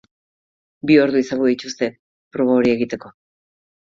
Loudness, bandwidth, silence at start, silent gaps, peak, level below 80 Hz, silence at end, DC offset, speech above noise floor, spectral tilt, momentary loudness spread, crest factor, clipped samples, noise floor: -18 LUFS; 7.6 kHz; 0.85 s; 1.99-2.31 s; -2 dBFS; -58 dBFS; 0.8 s; under 0.1%; over 73 dB; -5.5 dB/octave; 13 LU; 18 dB; under 0.1%; under -90 dBFS